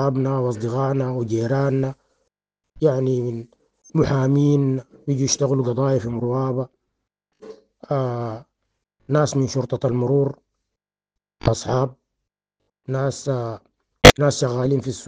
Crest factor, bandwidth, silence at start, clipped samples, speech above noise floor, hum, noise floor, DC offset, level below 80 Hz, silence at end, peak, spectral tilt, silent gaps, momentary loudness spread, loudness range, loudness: 22 dB; 10 kHz; 0 s; 0.1%; 65 dB; none; -86 dBFS; under 0.1%; -40 dBFS; 0 s; 0 dBFS; -5.5 dB/octave; none; 10 LU; 8 LU; -20 LUFS